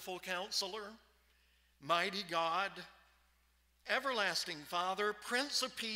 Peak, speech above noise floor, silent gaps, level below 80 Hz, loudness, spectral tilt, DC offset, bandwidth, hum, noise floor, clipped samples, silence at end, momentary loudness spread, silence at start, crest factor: -18 dBFS; 35 dB; none; -76 dBFS; -37 LUFS; -1.5 dB/octave; under 0.1%; 16 kHz; none; -73 dBFS; under 0.1%; 0 s; 16 LU; 0 s; 22 dB